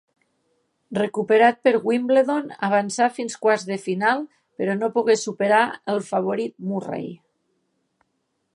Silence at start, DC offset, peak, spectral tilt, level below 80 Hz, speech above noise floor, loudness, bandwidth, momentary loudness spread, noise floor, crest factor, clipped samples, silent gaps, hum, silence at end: 0.9 s; under 0.1%; -4 dBFS; -5 dB/octave; -74 dBFS; 52 dB; -22 LUFS; 11 kHz; 11 LU; -73 dBFS; 20 dB; under 0.1%; none; none; 1.4 s